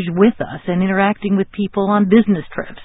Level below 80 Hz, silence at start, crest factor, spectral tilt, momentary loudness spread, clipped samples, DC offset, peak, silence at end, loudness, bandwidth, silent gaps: -48 dBFS; 0 s; 16 dB; -12.5 dB/octave; 8 LU; under 0.1%; under 0.1%; 0 dBFS; 0 s; -16 LUFS; 4 kHz; none